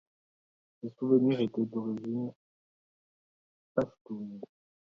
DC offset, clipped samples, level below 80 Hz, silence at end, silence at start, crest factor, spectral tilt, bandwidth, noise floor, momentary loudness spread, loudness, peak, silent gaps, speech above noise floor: under 0.1%; under 0.1%; -74 dBFS; 0.45 s; 0.85 s; 22 dB; -9.5 dB/octave; 6.4 kHz; under -90 dBFS; 19 LU; -32 LUFS; -12 dBFS; 2.36-3.75 s, 4.01-4.05 s; over 59 dB